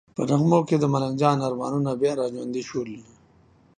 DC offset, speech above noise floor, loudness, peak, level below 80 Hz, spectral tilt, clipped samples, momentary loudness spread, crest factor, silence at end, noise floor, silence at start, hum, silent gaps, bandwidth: under 0.1%; 34 dB; -24 LUFS; -4 dBFS; -62 dBFS; -7.5 dB/octave; under 0.1%; 11 LU; 20 dB; 0.75 s; -57 dBFS; 0.2 s; none; none; 9.8 kHz